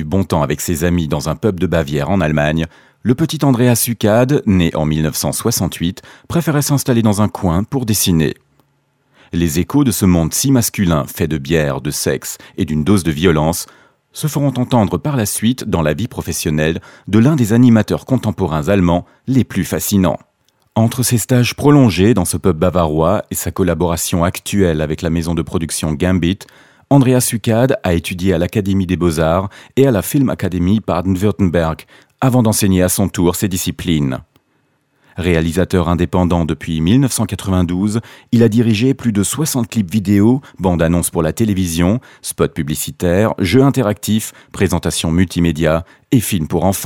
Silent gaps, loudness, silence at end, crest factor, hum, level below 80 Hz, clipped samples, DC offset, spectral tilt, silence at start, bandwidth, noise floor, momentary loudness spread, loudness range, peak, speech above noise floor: none; -15 LUFS; 0 s; 14 dB; none; -36 dBFS; under 0.1%; under 0.1%; -5.5 dB/octave; 0 s; 17.5 kHz; -61 dBFS; 7 LU; 3 LU; 0 dBFS; 46 dB